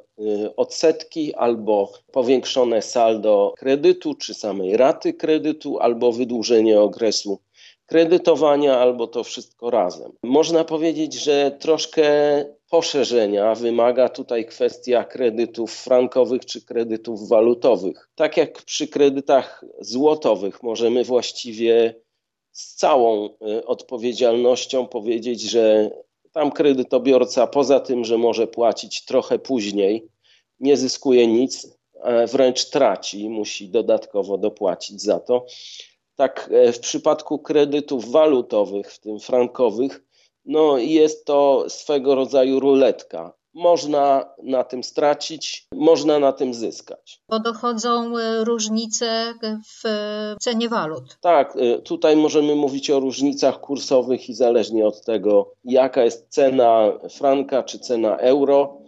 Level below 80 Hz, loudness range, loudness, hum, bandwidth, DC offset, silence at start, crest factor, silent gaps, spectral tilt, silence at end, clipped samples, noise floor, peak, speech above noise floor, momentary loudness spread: -76 dBFS; 3 LU; -19 LUFS; none; 8 kHz; under 0.1%; 0.2 s; 16 dB; none; -4 dB/octave; 0.1 s; under 0.1%; -71 dBFS; -4 dBFS; 52 dB; 10 LU